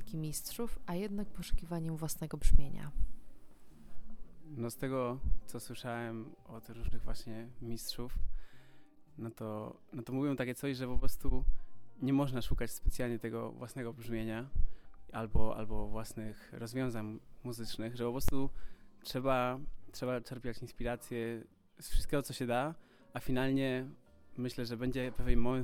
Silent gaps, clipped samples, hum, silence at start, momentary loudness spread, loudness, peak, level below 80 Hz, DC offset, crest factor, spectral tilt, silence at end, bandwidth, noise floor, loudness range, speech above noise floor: none; under 0.1%; none; 0 s; 13 LU; -39 LUFS; -10 dBFS; -40 dBFS; under 0.1%; 24 dB; -6 dB/octave; 0 s; 15.5 kHz; -54 dBFS; 5 LU; 23 dB